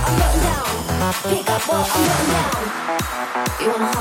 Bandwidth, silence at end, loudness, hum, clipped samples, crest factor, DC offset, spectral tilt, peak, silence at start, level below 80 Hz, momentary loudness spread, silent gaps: 17 kHz; 0 s; -19 LUFS; none; under 0.1%; 14 dB; under 0.1%; -4 dB/octave; -4 dBFS; 0 s; -28 dBFS; 5 LU; none